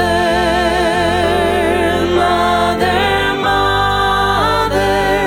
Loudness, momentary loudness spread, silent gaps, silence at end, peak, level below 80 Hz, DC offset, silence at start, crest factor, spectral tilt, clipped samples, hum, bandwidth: -13 LUFS; 1 LU; none; 0 s; -2 dBFS; -30 dBFS; under 0.1%; 0 s; 12 dB; -4.5 dB/octave; under 0.1%; none; 17.5 kHz